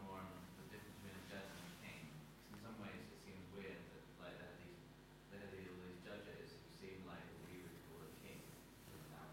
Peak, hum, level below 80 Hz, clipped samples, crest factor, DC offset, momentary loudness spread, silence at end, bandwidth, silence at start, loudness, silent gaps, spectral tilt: -40 dBFS; none; -72 dBFS; under 0.1%; 16 dB; under 0.1%; 6 LU; 0 s; 16.5 kHz; 0 s; -56 LUFS; none; -5 dB/octave